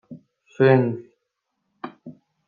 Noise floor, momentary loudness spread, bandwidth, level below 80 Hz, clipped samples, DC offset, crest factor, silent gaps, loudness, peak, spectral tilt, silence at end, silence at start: -77 dBFS; 22 LU; 4.7 kHz; -72 dBFS; under 0.1%; under 0.1%; 20 dB; none; -19 LUFS; -4 dBFS; -9.5 dB/octave; 0.35 s; 0.1 s